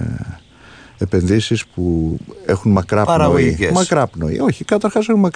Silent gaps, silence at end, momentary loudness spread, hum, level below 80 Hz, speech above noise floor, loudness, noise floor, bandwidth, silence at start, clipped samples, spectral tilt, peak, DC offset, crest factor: none; 0.05 s; 10 LU; none; -36 dBFS; 27 dB; -16 LUFS; -42 dBFS; 10.5 kHz; 0 s; under 0.1%; -6 dB/octave; -2 dBFS; under 0.1%; 14 dB